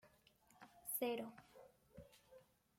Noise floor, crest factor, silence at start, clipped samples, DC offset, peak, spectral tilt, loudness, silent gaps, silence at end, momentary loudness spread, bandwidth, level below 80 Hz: -73 dBFS; 22 dB; 0.05 s; under 0.1%; under 0.1%; -30 dBFS; -3 dB/octave; -46 LUFS; none; 0.4 s; 24 LU; 16.5 kHz; -82 dBFS